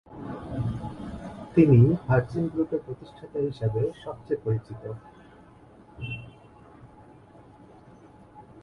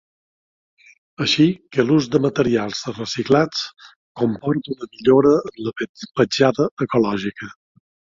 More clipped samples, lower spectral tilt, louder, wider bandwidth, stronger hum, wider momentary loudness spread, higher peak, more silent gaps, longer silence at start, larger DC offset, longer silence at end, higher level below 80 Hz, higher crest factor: neither; first, -10 dB/octave vs -5.5 dB/octave; second, -26 LUFS vs -19 LUFS; second, 5.4 kHz vs 7.6 kHz; neither; first, 21 LU vs 12 LU; second, -6 dBFS vs -2 dBFS; second, none vs 3.96-4.15 s, 5.89-5.95 s, 6.71-6.77 s; second, 0.1 s vs 1.2 s; neither; second, 0.05 s vs 0.65 s; first, -50 dBFS vs -56 dBFS; about the same, 22 dB vs 18 dB